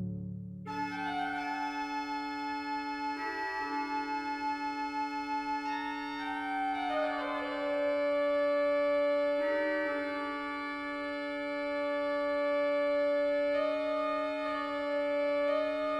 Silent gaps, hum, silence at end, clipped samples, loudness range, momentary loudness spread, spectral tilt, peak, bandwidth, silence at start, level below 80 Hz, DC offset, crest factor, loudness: none; none; 0 s; under 0.1%; 5 LU; 7 LU; -5.5 dB/octave; -20 dBFS; 9.8 kHz; 0 s; -66 dBFS; under 0.1%; 12 dB; -33 LUFS